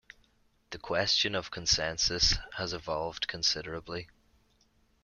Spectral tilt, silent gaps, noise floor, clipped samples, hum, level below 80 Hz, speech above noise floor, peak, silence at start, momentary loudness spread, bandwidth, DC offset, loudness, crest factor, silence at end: -2 dB/octave; none; -69 dBFS; under 0.1%; none; -48 dBFS; 37 dB; -12 dBFS; 0.7 s; 14 LU; 13 kHz; under 0.1%; -29 LUFS; 20 dB; 0.95 s